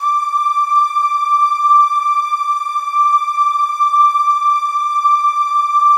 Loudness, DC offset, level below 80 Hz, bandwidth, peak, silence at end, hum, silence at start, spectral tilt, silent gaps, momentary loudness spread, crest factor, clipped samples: -13 LUFS; under 0.1%; -88 dBFS; 12.5 kHz; -4 dBFS; 0 s; none; 0 s; 6 dB/octave; none; 5 LU; 10 dB; under 0.1%